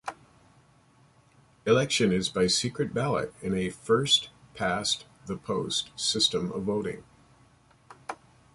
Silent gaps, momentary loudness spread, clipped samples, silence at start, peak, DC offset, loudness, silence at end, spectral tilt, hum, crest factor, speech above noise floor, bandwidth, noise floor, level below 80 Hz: none; 18 LU; under 0.1%; 0.05 s; -10 dBFS; under 0.1%; -27 LUFS; 0.4 s; -3.5 dB/octave; none; 20 dB; 33 dB; 11.5 kHz; -61 dBFS; -58 dBFS